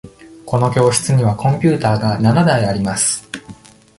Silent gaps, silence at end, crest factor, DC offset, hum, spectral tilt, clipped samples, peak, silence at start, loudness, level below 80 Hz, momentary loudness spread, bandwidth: none; 0.45 s; 14 dB; under 0.1%; none; -5.5 dB/octave; under 0.1%; -2 dBFS; 0.05 s; -15 LUFS; -44 dBFS; 8 LU; 11.5 kHz